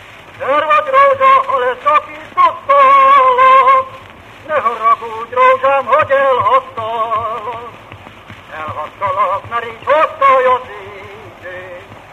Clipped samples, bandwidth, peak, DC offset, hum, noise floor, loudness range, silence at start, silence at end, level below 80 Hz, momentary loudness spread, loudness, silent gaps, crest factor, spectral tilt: under 0.1%; 9.2 kHz; 0 dBFS; under 0.1%; none; -36 dBFS; 8 LU; 0.1 s; 0.15 s; -52 dBFS; 22 LU; -11 LUFS; none; 14 dB; -4.5 dB/octave